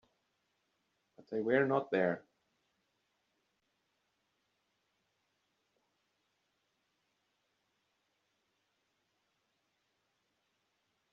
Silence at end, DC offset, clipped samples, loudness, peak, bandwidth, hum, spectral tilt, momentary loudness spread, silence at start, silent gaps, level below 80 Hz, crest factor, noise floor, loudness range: 8.95 s; under 0.1%; under 0.1%; -34 LUFS; -18 dBFS; 6.8 kHz; none; -5.5 dB/octave; 11 LU; 1.3 s; none; -86 dBFS; 26 dB; -82 dBFS; 5 LU